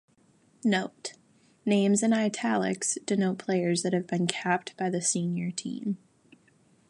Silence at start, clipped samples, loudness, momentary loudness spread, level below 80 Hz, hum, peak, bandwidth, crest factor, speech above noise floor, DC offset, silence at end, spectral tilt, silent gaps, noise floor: 0.65 s; under 0.1%; -28 LUFS; 11 LU; -76 dBFS; none; -6 dBFS; 11.5 kHz; 22 dB; 36 dB; under 0.1%; 0.95 s; -4.5 dB/octave; none; -64 dBFS